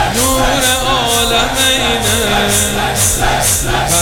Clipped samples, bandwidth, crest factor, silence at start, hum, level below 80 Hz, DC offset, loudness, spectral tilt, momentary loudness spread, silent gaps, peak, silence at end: under 0.1%; 20 kHz; 12 dB; 0 s; none; -24 dBFS; under 0.1%; -11 LUFS; -2 dB/octave; 2 LU; none; 0 dBFS; 0 s